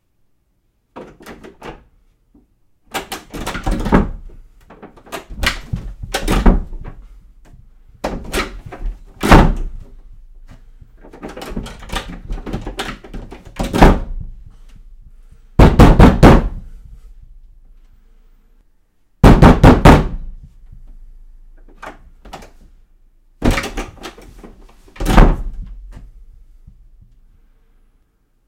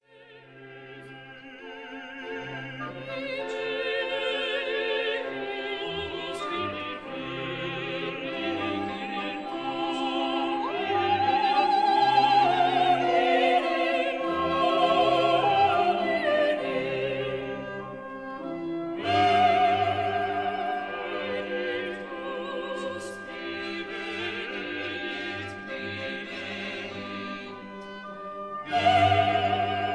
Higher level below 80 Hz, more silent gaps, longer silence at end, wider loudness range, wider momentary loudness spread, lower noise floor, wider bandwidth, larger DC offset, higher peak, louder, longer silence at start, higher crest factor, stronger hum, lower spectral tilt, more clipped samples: first, -20 dBFS vs -64 dBFS; neither; first, 2.5 s vs 0 s; first, 15 LU vs 10 LU; first, 28 LU vs 15 LU; first, -63 dBFS vs -52 dBFS; first, 16 kHz vs 11 kHz; neither; first, 0 dBFS vs -10 dBFS; first, -14 LUFS vs -27 LUFS; first, 0.95 s vs 0.15 s; about the same, 16 dB vs 18 dB; neither; about the same, -6.5 dB/octave vs -5.5 dB/octave; first, 0.4% vs under 0.1%